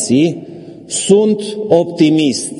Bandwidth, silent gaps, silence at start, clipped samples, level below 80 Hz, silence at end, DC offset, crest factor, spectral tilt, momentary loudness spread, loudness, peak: 11.5 kHz; none; 0 s; under 0.1%; -58 dBFS; 0 s; under 0.1%; 14 dB; -5 dB/octave; 16 LU; -13 LUFS; 0 dBFS